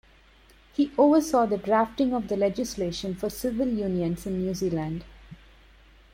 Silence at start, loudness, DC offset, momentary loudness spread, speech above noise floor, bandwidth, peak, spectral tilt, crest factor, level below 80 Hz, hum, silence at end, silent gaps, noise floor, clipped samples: 0.8 s; -26 LUFS; under 0.1%; 10 LU; 31 dB; 16.5 kHz; -10 dBFS; -6 dB/octave; 18 dB; -50 dBFS; none; 0.8 s; none; -56 dBFS; under 0.1%